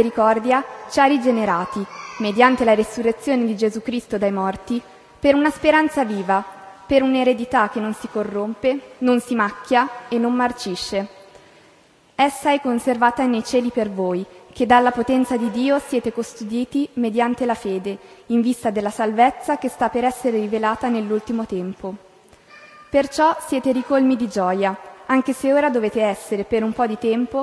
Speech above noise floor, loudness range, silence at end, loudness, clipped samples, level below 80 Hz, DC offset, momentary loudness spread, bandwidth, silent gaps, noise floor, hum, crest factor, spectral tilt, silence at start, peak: 34 dB; 4 LU; 0 s; -20 LUFS; under 0.1%; -54 dBFS; under 0.1%; 10 LU; 11 kHz; none; -53 dBFS; none; 20 dB; -5 dB/octave; 0 s; 0 dBFS